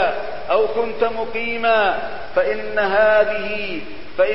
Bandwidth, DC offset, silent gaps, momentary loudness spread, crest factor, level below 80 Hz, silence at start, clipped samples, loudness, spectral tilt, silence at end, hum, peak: 5.8 kHz; 4%; none; 11 LU; 16 dB; -48 dBFS; 0 s; under 0.1%; -19 LUFS; -8.5 dB/octave; 0 s; none; -2 dBFS